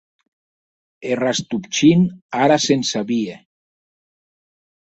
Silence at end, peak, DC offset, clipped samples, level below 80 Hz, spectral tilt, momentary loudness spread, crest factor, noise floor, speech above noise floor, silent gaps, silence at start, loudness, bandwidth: 1.45 s; -2 dBFS; under 0.1%; under 0.1%; -60 dBFS; -5 dB/octave; 10 LU; 18 dB; under -90 dBFS; over 72 dB; 2.22-2.29 s; 1 s; -18 LUFS; 8.2 kHz